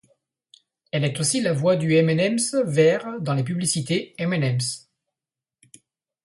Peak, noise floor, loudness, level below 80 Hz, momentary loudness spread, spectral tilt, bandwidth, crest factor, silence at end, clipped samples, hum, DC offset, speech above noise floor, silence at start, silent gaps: -6 dBFS; -89 dBFS; -22 LUFS; -64 dBFS; 7 LU; -5 dB/octave; 11.5 kHz; 18 dB; 1.45 s; under 0.1%; none; under 0.1%; 68 dB; 0.95 s; none